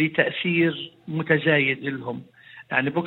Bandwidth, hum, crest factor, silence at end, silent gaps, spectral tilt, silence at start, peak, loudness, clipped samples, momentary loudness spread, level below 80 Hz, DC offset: 4.2 kHz; none; 20 dB; 0 s; none; -8.5 dB/octave; 0 s; -4 dBFS; -23 LUFS; under 0.1%; 14 LU; -70 dBFS; under 0.1%